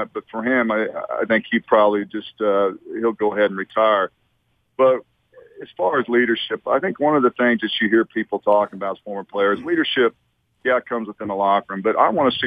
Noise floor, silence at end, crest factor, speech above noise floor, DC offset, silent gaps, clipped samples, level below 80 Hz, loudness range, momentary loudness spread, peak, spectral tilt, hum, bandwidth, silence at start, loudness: -67 dBFS; 0 s; 18 dB; 47 dB; under 0.1%; none; under 0.1%; -64 dBFS; 2 LU; 9 LU; -2 dBFS; -7.5 dB/octave; none; 5 kHz; 0 s; -20 LUFS